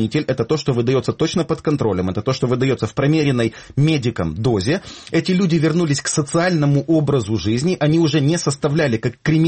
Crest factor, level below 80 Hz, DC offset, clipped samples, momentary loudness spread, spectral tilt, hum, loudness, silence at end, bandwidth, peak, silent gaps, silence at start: 12 dB; -46 dBFS; under 0.1%; under 0.1%; 5 LU; -6 dB/octave; none; -18 LUFS; 0 s; 8.8 kHz; -6 dBFS; none; 0 s